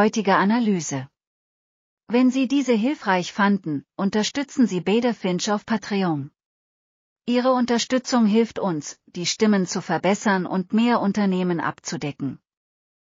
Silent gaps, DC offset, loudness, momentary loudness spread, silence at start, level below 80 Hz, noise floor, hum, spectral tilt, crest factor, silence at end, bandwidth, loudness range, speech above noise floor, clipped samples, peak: 1.27-1.97 s, 6.46-7.16 s; under 0.1%; -22 LUFS; 10 LU; 0 s; -68 dBFS; under -90 dBFS; none; -5 dB/octave; 18 dB; 0.8 s; 7.6 kHz; 2 LU; over 69 dB; under 0.1%; -6 dBFS